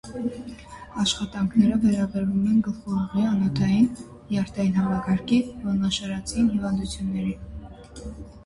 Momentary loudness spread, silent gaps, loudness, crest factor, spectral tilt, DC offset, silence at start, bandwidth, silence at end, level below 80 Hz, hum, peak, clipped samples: 19 LU; none; -24 LUFS; 18 dB; -6 dB/octave; under 0.1%; 0.05 s; 11.5 kHz; 0.05 s; -44 dBFS; none; -6 dBFS; under 0.1%